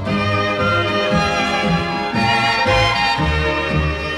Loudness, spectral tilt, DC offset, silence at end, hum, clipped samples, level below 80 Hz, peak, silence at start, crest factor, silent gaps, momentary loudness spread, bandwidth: -17 LUFS; -5 dB/octave; under 0.1%; 0 s; none; under 0.1%; -32 dBFS; -4 dBFS; 0 s; 14 dB; none; 4 LU; 14 kHz